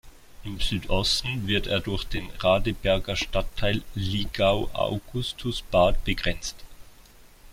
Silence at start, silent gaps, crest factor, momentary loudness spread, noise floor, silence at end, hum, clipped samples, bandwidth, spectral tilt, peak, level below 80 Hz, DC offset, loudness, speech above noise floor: 0.05 s; none; 18 dB; 8 LU; -51 dBFS; 0 s; none; under 0.1%; 16 kHz; -4.5 dB/octave; -8 dBFS; -34 dBFS; under 0.1%; -26 LUFS; 26 dB